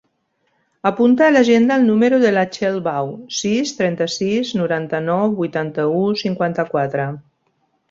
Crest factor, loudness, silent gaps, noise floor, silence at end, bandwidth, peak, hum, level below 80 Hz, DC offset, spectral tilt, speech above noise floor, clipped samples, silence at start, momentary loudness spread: 16 dB; -17 LUFS; none; -67 dBFS; 0.7 s; 7.8 kHz; -2 dBFS; none; -60 dBFS; under 0.1%; -5.5 dB/octave; 50 dB; under 0.1%; 0.85 s; 9 LU